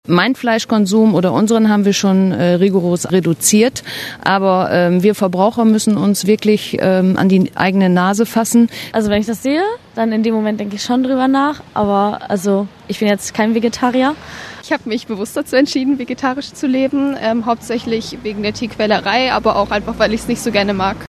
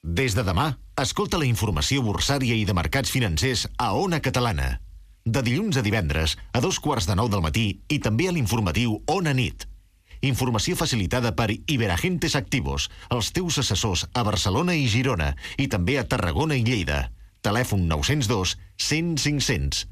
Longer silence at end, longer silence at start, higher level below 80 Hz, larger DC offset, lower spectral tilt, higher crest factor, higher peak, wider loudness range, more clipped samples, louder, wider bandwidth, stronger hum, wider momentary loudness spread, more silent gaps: about the same, 0 s vs 0 s; about the same, 0.1 s vs 0.05 s; second, -46 dBFS vs -38 dBFS; neither; about the same, -5 dB/octave vs -4.5 dB/octave; about the same, 14 dB vs 14 dB; first, 0 dBFS vs -10 dBFS; first, 4 LU vs 1 LU; neither; first, -15 LUFS vs -24 LUFS; second, 13.5 kHz vs 15.5 kHz; neither; first, 8 LU vs 5 LU; neither